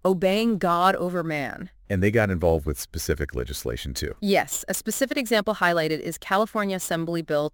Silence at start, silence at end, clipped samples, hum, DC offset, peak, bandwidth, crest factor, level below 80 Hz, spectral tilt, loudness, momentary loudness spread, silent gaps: 0.05 s; 0.05 s; under 0.1%; none; under 0.1%; -6 dBFS; 17 kHz; 18 dB; -42 dBFS; -4.5 dB/octave; -24 LUFS; 9 LU; none